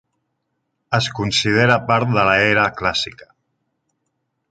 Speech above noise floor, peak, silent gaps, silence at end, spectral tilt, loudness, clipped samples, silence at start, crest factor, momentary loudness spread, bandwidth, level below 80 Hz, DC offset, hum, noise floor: 56 dB; -2 dBFS; none; 1.3 s; -4.5 dB/octave; -17 LUFS; under 0.1%; 0.9 s; 18 dB; 7 LU; 9.2 kHz; -48 dBFS; under 0.1%; none; -73 dBFS